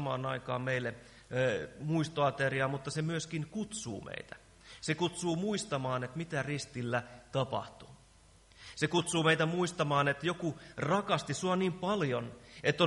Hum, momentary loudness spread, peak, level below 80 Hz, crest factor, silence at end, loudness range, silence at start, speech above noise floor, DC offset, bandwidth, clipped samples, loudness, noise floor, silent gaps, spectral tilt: none; 12 LU; -14 dBFS; -64 dBFS; 20 dB; 0 s; 5 LU; 0 s; 28 dB; under 0.1%; 11.5 kHz; under 0.1%; -34 LUFS; -61 dBFS; none; -5 dB/octave